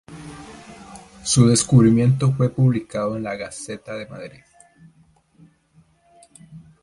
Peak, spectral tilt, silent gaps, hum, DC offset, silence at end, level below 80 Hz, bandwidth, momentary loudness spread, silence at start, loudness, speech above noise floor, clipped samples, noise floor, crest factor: -2 dBFS; -6 dB/octave; none; none; under 0.1%; 0.25 s; -50 dBFS; 11.5 kHz; 26 LU; 0.1 s; -19 LUFS; 39 dB; under 0.1%; -57 dBFS; 20 dB